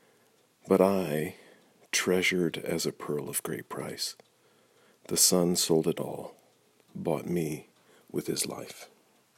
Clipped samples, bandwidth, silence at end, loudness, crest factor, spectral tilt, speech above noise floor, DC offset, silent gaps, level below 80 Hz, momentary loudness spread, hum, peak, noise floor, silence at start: under 0.1%; 16 kHz; 0.55 s; -29 LUFS; 22 dB; -3.5 dB/octave; 37 dB; under 0.1%; none; -68 dBFS; 16 LU; none; -8 dBFS; -65 dBFS; 0.65 s